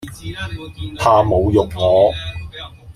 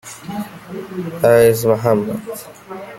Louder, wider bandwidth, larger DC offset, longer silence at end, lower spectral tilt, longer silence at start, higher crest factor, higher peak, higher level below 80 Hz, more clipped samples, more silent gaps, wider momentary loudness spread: about the same, -15 LUFS vs -15 LUFS; about the same, 15 kHz vs 16.5 kHz; neither; about the same, 0.05 s vs 0 s; about the same, -6.5 dB/octave vs -6 dB/octave; about the same, 0 s vs 0.05 s; about the same, 16 dB vs 16 dB; about the same, 0 dBFS vs 0 dBFS; first, -36 dBFS vs -52 dBFS; neither; neither; second, 17 LU vs 20 LU